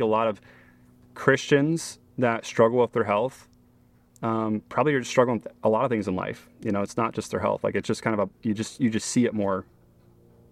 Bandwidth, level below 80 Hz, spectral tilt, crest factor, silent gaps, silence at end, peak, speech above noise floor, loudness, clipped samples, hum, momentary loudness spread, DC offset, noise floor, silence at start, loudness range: 13.5 kHz; -62 dBFS; -5.5 dB/octave; 22 dB; none; 0.9 s; -4 dBFS; 34 dB; -25 LUFS; under 0.1%; none; 8 LU; under 0.1%; -59 dBFS; 0 s; 2 LU